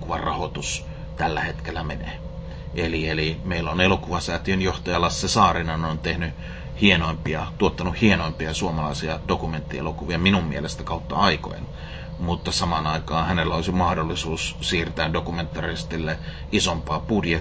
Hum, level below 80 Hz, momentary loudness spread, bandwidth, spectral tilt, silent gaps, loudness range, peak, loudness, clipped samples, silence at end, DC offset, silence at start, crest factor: none; -34 dBFS; 11 LU; 8 kHz; -5 dB/octave; none; 3 LU; -2 dBFS; -24 LUFS; under 0.1%; 0 s; under 0.1%; 0 s; 22 dB